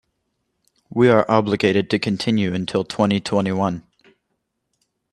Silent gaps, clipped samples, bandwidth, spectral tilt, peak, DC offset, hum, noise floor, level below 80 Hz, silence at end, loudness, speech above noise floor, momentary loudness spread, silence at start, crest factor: none; under 0.1%; 11 kHz; -6.5 dB/octave; 0 dBFS; under 0.1%; none; -74 dBFS; -58 dBFS; 1.3 s; -19 LUFS; 56 dB; 8 LU; 0.95 s; 20 dB